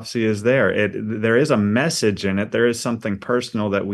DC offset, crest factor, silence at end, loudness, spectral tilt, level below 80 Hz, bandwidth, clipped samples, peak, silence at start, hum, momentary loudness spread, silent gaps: under 0.1%; 16 dB; 0 s; -20 LUFS; -5.5 dB/octave; -58 dBFS; 12.5 kHz; under 0.1%; -4 dBFS; 0 s; none; 6 LU; none